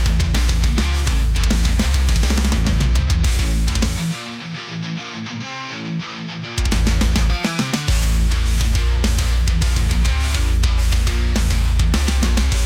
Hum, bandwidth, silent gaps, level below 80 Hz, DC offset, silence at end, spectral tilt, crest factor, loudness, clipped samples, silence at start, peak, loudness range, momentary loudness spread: none; 16 kHz; none; -18 dBFS; under 0.1%; 0 s; -4.5 dB/octave; 10 dB; -19 LUFS; under 0.1%; 0 s; -6 dBFS; 5 LU; 9 LU